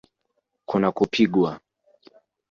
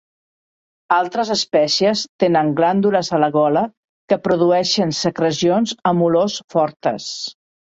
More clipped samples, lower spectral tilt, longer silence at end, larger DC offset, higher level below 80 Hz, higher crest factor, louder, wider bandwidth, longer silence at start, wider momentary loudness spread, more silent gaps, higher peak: neither; first, -6.5 dB/octave vs -5 dB/octave; first, 0.95 s vs 0.45 s; neither; about the same, -60 dBFS vs -60 dBFS; about the same, 20 dB vs 16 dB; second, -22 LUFS vs -18 LUFS; about the same, 7.4 kHz vs 8 kHz; second, 0.7 s vs 0.9 s; about the same, 8 LU vs 7 LU; second, none vs 2.09-2.19 s, 3.77-3.83 s, 3.89-4.08 s, 6.44-6.48 s; second, -6 dBFS vs -2 dBFS